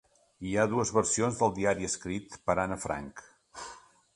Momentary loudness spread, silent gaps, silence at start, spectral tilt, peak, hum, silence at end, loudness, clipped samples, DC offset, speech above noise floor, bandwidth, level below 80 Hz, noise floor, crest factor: 18 LU; none; 0.4 s; -4.5 dB/octave; -10 dBFS; none; 0.35 s; -30 LUFS; under 0.1%; under 0.1%; 21 dB; 11.5 kHz; -56 dBFS; -51 dBFS; 22 dB